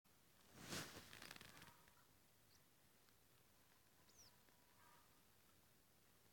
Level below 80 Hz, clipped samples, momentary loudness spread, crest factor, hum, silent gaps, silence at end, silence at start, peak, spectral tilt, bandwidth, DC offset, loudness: -84 dBFS; under 0.1%; 16 LU; 30 dB; none; none; 0 s; 0.05 s; -34 dBFS; -2.5 dB/octave; 17 kHz; under 0.1%; -57 LUFS